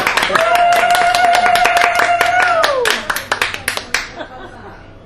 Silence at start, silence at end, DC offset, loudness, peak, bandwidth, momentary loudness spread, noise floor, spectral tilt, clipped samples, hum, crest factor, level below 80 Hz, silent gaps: 0 s; 0.1 s; under 0.1%; -13 LUFS; 0 dBFS; 15 kHz; 14 LU; -35 dBFS; -1.5 dB/octave; under 0.1%; none; 14 dB; -42 dBFS; none